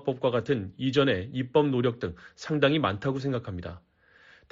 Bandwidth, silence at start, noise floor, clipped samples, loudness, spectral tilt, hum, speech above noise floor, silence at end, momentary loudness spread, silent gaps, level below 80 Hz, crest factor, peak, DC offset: 7.6 kHz; 0 s; -58 dBFS; under 0.1%; -27 LUFS; -5 dB/octave; none; 30 dB; 0.75 s; 13 LU; none; -58 dBFS; 18 dB; -10 dBFS; under 0.1%